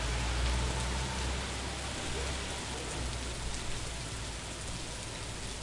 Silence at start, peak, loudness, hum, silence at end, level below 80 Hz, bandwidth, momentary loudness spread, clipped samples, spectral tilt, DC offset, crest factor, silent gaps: 0 s; -20 dBFS; -36 LUFS; none; 0 s; -40 dBFS; 11.5 kHz; 7 LU; under 0.1%; -3.5 dB/octave; under 0.1%; 16 dB; none